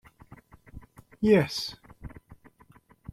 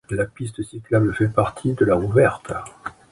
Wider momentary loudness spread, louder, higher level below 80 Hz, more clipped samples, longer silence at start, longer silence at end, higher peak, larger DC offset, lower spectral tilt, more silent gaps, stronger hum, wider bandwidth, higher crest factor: first, 26 LU vs 14 LU; second, -26 LUFS vs -21 LUFS; second, -54 dBFS vs -44 dBFS; neither; first, 0.75 s vs 0.1 s; first, 0.8 s vs 0.2 s; second, -10 dBFS vs -2 dBFS; neither; second, -6 dB/octave vs -7.5 dB/octave; neither; neither; first, 14.5 kHz vs 11.5 kHz; about the same, 22 dB vs 18 dB